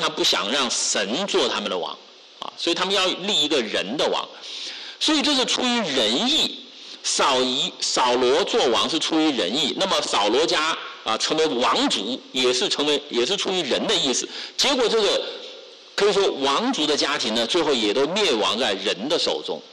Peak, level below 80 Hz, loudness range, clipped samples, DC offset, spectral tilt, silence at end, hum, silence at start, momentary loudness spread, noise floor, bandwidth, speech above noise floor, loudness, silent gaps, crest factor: -12 dBFS; -60 dBFS; 2 LU; under 0.1%; under 0.1%; -2 dB/octave; 0 s; none; 0 s; 9 LU; -42 dBFS; 12 kHz; 20 dB; -21 LUFS; none; 10 dB